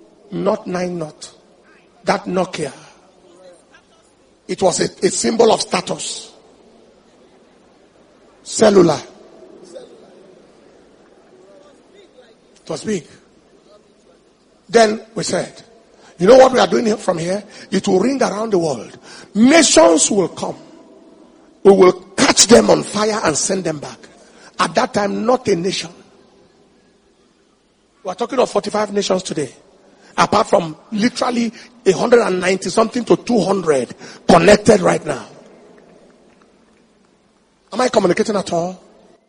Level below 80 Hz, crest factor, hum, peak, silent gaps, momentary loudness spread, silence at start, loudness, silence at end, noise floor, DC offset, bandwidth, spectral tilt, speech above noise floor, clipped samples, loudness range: -50 dBFS; 18 dB; none; 0 dBFS; none; 18 LU; 0.3 s; -15 LUFS; 0.5 s; -57 dBFS; under 0.1%; 10.5 kHz; -4 dB/octave; 42 dB; under 0.1%; 11 LU